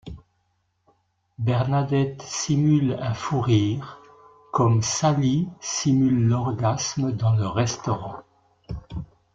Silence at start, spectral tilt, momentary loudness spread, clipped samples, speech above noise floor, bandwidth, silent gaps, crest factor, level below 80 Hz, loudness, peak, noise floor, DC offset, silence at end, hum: 0.05 s; -6 dB/octave; 16 LU; under 0.1%; 48 dB; 7.8 kHz; none; 16 dB; -50 dBFS; -23 LUFS; -8 dBFS; -71 dBFS; under 0.1%; 0.3 s; none